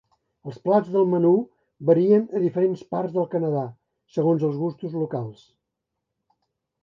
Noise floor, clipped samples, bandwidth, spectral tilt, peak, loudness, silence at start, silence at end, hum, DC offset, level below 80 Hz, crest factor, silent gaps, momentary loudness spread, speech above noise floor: -82 dBFS; under 0.1%; 6.8 kHz; -10.5 dB/octave; -6 dBFS; -23 LUFS; 0.45 s; 1.5 s; none; under 0.1%; -72 dBFS; 18 dB; none; 13 LU; 60 dB